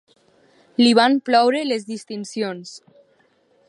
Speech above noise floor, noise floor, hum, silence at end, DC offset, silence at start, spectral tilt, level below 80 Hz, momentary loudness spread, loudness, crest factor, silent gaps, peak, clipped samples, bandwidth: 41 dB; -60 dBFS; none; 0.9 s; under 0.1%; 0.8 s; -4 dB/octave; -76 dBFS; 16 LU; -19 LUFS; 20 dB; none; -2 dBFS; under 0.1%; 11 kHz